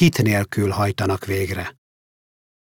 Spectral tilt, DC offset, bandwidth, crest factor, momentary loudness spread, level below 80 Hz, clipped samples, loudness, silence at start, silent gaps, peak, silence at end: -6 dB/octave; under 0.1%; 17.5 kHz; 16 dB; 9 LU; -52 dBFS; under 0.1%; -21 LUFS; 0 s; none; -4 dBFS; 1.05 s